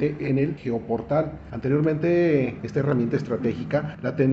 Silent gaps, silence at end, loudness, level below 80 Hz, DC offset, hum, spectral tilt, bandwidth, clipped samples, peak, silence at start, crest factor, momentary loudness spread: none; 0 s; -24 LUFS; -52 dBFS; under 0.1%; none; -9.5 dB/octave; 7.2 kHz; under 0.1%; -8 dBFS; 0 s; 16 dB; 7 LU